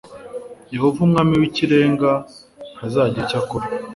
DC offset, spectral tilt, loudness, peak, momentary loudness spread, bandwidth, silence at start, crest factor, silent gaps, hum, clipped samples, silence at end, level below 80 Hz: under 0.1%; -7.5 dB/octave; -18 LUFS; -2 dBFS; 19 LU; 11.5 kHz; 0.05 s; 16 dB; none; none; under 0.1%; 0 s; -50 dBFS